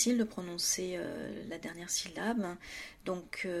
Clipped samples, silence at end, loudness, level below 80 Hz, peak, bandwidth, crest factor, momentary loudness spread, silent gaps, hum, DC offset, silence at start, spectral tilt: under 0.1%; 0 s; -36 LUFS; -64 dBFS; -16 dBFS; 16 kHz; 20 dB; 11 LU; none; none; under 0.1%; 0 s; -2.5 dB/octave